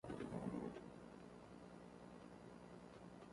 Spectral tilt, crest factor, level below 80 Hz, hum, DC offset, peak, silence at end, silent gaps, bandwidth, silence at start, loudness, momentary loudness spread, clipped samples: -7 dB/octave; 20 dB; -72 dBFS; 60 Hz at -65 dBFS; under 0.1%; -34 dBFS; 0 s; none; 11.5 kHz; 0.05 s; -55 LUFS; 11 LU; under 0.1%